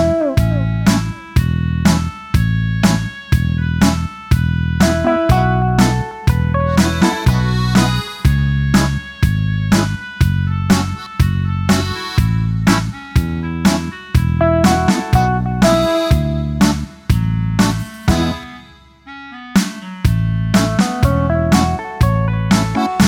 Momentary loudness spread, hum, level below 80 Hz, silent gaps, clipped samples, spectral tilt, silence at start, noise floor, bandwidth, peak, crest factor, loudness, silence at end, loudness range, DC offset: 5 LU; none; -24 dBFS; none; under 0.1%; -6 dB/octave; 0 s; -42 dBFS; 18 kHz; 0 dBFS; 14 dB; -16 LUFS; 0 s; 3 LU; under 0.1%